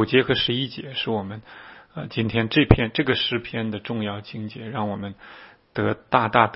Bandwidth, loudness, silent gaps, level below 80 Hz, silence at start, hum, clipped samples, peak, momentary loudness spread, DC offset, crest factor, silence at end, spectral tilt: 5.8 kHz; -23 LUFS; none; -40 dBFS; 0 s; none; under 0.1%; 0 dBFS; 18 LU; under 0.1%; 24 dB; 0 s; -10 dB/octave